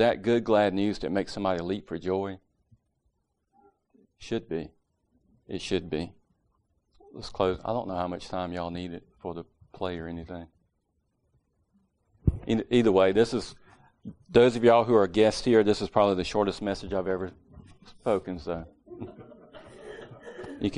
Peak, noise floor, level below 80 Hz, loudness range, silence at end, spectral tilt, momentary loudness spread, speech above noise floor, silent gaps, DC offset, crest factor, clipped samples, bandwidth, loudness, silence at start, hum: -6 dBFS; -75 dBFS; -50 dBFS; 14 LU; 0 s; -6 dB/octave; 22 LU; 49 dB; none; under 0.1%; 22 dB; under 0.1%; 10.5 kHz; -27 LUFS; 0 s; none